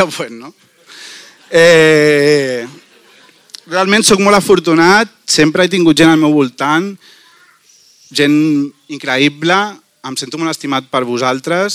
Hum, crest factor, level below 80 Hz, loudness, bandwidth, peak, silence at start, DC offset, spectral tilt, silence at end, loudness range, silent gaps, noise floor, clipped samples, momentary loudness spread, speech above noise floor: none; 12 dB; -50 dBFS; -11 LUFS; 16 kHz; 0 dBFS; 0 s; under 0.1%; -4 dB/octave; 0 s; 6 LU; none; -48 dBFS; under 0.1%; 15 LU; 36 dB